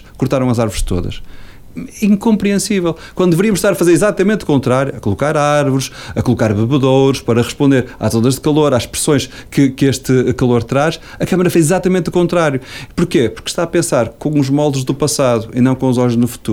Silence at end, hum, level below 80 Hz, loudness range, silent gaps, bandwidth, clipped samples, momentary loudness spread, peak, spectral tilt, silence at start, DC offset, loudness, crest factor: 0 s; none; -34 dBFS; 2 LU; none; 17.5 kHz; under 0.1%; 7 LU; -2 dBFS; -6 dB/octave; 0.05 s; under 0.1%; -14 LUFS; 12 dB